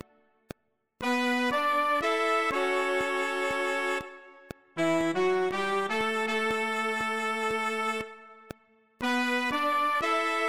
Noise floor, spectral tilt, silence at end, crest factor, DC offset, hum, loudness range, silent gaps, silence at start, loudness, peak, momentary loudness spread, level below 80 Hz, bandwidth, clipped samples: -53 dBFS; -3.5 dB/octave; 0 s; 14 dB; 0.2%; none; 3 LU; none; 1 s; -28 LUFS; -16 dBFS; 9 LU; -64 dBFS; 16 kHz; under 0.1%